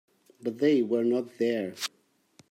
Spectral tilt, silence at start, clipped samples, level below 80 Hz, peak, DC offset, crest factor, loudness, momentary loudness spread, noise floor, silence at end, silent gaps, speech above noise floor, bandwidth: -5 dB/octave; 0.4 s; under 0.1%; -82 dBFS; -14 dBFS; under 0.1%; 16 dB; -28 LUFS; 11 LU; -62 dBFS; 0.65 s; none; 35 dB; 16 kHz